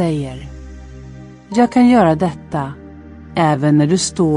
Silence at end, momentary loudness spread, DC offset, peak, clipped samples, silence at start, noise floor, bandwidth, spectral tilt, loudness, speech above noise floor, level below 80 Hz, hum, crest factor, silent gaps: 0 s; 25 LU; under 0.1%; -2 dBFS; under 0.1%; 0 s; -36 dBFS; 11 kHz; -6 dB/octave; -15 LUFS; 22 dB; -40 dBFS; none; 14 dB; none